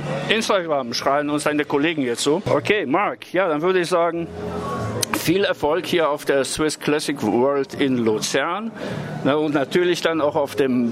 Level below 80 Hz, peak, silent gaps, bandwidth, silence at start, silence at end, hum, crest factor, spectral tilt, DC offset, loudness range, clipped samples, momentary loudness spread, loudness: -54 dBFS; 0 dBFS; none; 16 kHz; 0 s; 0 s; none; 20 dB; -4.5 dB/octave; under 0.1%; 1 LU; under 0.1%; 6 LU; -21 LUFS